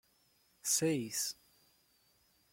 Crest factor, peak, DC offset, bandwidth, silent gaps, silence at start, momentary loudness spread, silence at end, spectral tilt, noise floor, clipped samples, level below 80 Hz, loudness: 22 dB; -18 dBFS; under 0.1%; 16.5 kHz; none; 0.65 s; 10 LU; 1.2 s; -3 dB/octave; -72 dBFS; under 0.1%; -78 dBFS; -34 LUFS